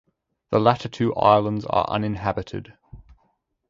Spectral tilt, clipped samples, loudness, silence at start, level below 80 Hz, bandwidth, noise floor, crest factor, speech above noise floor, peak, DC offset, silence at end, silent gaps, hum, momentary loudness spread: -7.5 dB/octave; under 0.1%; -22 LUFS; 0.5 s; -50 dBFS; 7.6 kHz; -69 dBFS; 22 dB; 48 dB; -2 dBFS; under 0.1%; 0.7 s; none; none; 12 LU